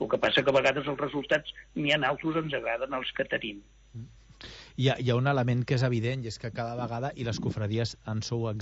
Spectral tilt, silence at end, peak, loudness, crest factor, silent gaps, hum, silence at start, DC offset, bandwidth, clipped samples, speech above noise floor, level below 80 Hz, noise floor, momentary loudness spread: -6 dB/octave; 0 s; -12 dBFS; -29 LUFS; 18 dB; none; none; 0 s; under 0.1%; 8 kHz; under 0.1%; 20 dB; -56 dBFS; -49 dBFS; 17 LU